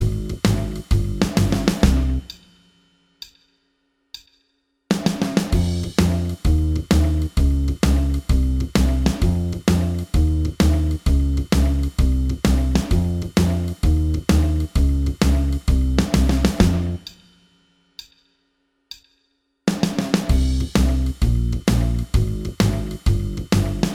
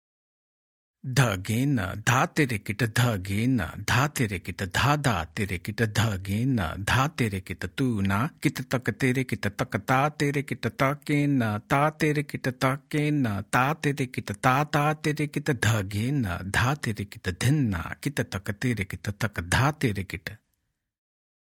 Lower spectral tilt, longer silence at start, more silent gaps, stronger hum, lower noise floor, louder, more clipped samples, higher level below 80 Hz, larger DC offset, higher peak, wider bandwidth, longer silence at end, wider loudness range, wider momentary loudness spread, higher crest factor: about the same, -6.5 dB/octave vs -5.5 dB/octave; second, 0 s vs 1.05 s; neither; neither; second, -68 dBFS vs -78 dBFS; first, -20 LUFS vs -26 LUFS; neither; first, -22 dBFS vs -52 dBFS; neither; first, 0 dBFS vs -4 dBFS; about the same, 16 kHz vs 17 kHz; second, 0 s vs 1.1 s; first, 6 LU vs 2 LU; about the same, 8 LU vs 7 LU; about the same, 18 dB vs 22 dB